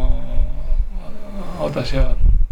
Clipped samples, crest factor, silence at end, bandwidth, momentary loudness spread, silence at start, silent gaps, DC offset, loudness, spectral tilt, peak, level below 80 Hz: under 0.1%; 10 dB; 0.05 s; 5.4 kHz; 13 LU; 0 s; none; under 0.1%; -24 LUFS; -7 dB/octave; -4 dBFS; -16 dBFS